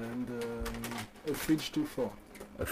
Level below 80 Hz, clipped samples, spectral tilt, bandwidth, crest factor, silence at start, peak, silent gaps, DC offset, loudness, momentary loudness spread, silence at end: -52 dBFS; under 0.1%; -5 dB/octave; 15.5 kHz; 18 dB; 0 s; -18 dBFS; none; under 0.1%; -36 LUFS; 9 LU; 0 s